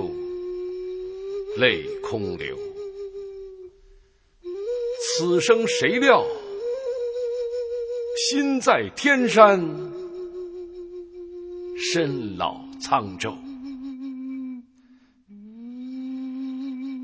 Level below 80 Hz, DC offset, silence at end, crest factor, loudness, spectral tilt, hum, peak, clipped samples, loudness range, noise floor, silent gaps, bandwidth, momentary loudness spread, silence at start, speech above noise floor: -58 dBFS; under 0.1%; 0 s; 24 dB; -24 LUFS; -3.5 dB/octave; none; 0 dBFS; under 0.1%; 12 LU; -56 dBFS; none; 8 kHz; 19 LU; 0 s; 35 dB